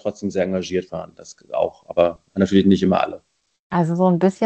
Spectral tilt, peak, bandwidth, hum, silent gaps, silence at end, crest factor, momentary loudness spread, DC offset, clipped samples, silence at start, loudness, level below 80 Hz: -7.5 dB/octave; -2 dBFS; 8.4 kHz; none; 3.60-3.70 s; 0 s; 18 dB; 14 LU; under 0.1%; under 0.1%; 0.05 s; -20 LUFS; -54 dBFS